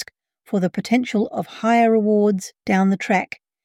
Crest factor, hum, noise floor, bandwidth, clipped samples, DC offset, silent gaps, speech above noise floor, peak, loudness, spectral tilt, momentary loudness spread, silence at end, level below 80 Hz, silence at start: 14 dB; none; -42 dBFS; 13.5 kHz; under 0.1%; under 0.1%; none; 23 dB; -6 dBFS; -20 LUFS; -6.5 dB/octave; 10 LU; 0.4 s; -66 dBFS; 0 s